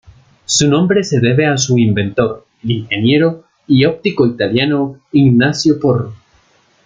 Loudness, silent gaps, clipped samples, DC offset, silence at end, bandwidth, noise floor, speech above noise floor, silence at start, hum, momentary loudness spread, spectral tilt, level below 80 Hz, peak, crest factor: -13 LUFS; none; under 0.1%; under 0.1%; 0.7 s; 9.4 kHz; -53 dBFS; 40 dB; 0.5 s; none; 8 LU; -5 dB/octave; -50 dBFS; 0 dBFS; 14 dB